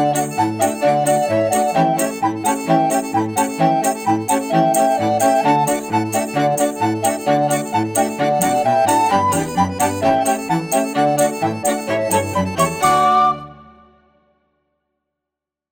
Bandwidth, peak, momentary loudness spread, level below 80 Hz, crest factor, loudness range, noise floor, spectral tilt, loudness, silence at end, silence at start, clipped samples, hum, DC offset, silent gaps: 17.5 kHz; -2 dBFS; 5 LU; -54 dBFS; 14 dB; 2 LU; -84 dBFS; -4.5 dB/octave; -17 LUFS; 2.1 s; 0 s; under 0.1%; none; under 0.1%; none